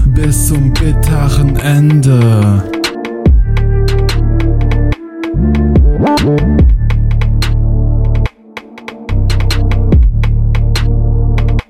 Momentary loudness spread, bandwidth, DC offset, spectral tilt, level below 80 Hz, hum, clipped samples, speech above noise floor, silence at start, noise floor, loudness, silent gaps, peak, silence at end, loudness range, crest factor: 8 LU; 15.5 kHz; 0.6%; -6.5 dB/octave; -12 dBFS; none; under 0.1%; 23 dB; 0 s; -31 dBFS; -12 LUFS; none; 0 dBFS; 0.1 s; 3 LU; 8 dB